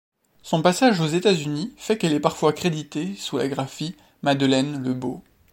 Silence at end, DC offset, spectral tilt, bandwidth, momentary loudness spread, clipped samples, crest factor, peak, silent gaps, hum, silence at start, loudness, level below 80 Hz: 0.35 s; under 0.1%; -5.5 dB/octave; 16.5 kHz; 11 LU; under 0.1%; 22 dB; -2 dBFS; none; none; 0.45 s; -23 LUFS; -62 dBFS